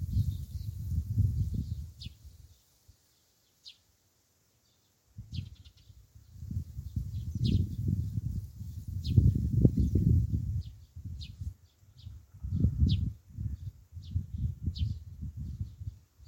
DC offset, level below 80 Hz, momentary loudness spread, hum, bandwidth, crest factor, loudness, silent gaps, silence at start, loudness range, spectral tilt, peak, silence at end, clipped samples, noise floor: under 0.1%; -40 dBFS; 21 LU; none; 16.5 kHz; 26 dB; -33 LUFS; none; 0 s; 20 LU; -8.5 dB/octave; -6 dBFS; 0.3 s; under 0.1%; -71 dBFS